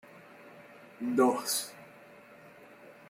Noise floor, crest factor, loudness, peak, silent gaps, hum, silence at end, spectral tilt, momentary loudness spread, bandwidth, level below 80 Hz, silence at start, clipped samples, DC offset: -54 dBFS; 22 dB; -30 LUFS; -14 dBFS; none; none; 0.15 s; -3 dB/octave; 26 LU; 16.5 kHz; -80 dBFS; 0.15 s; under 0.1%; under 0.1%